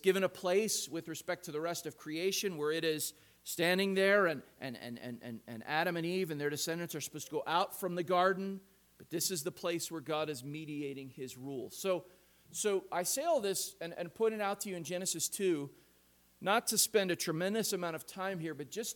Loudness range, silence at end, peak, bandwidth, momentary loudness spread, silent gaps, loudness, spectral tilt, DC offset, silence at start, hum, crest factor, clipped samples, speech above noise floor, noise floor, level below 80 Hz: 5 LU; 0 s; -14 dBFS; 19 kHz; 13 LU; none; -35 LUFS; -3 dB/octave; under 0.1%; 0.05 s; none; 22 dB; under 0.1%; 33 dB; -68 dBFS; -78 dBFS